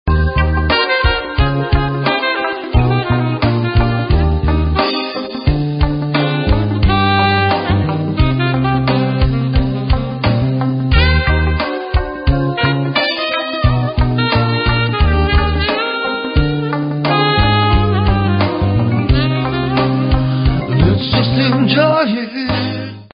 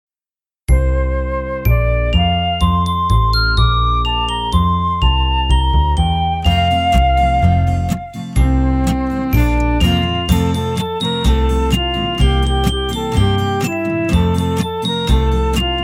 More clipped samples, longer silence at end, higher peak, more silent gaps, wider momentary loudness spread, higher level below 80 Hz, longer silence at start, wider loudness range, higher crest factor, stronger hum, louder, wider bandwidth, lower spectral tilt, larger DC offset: neither; about the same, 0.05 s vs 0 s; about the same, 0 dBFS vs 0 dBFS; neither; about the same, 5 LU vs 5 LU; about the same, -20 dBFS vs -18 dBFS; second, 0.05 s vs 0.7 s; about the same, 1 LU vs 2 LU; about the same, 14 dB vs 14 dB; neither; about the same, -15 LUFS vs -16 LUFS; second, 5.4 kHz vs 16 kHz; first, -12 dB/octave vs -6 dB/octave; neither